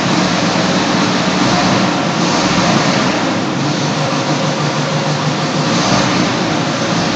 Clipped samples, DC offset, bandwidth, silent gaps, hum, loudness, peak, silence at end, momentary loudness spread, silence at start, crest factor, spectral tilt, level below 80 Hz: under 0.1%; under 0.1%; 9 kHz; none; none; -14 LUFS; 0 dBFS; 0 s; 4 LU; 0 s; 14 dB; -4.5 dB/octave; -44 dBFS